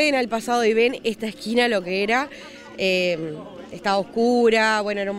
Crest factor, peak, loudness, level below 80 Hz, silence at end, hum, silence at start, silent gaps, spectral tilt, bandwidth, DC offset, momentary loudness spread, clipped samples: 16 dB; -6 dBFS; -21 LUFS; -58 dBFS; 0 s; none; 0 s; none; -4 dB/octave; 15.5 kHz; under 0.1%; 15 LU; under 0.1%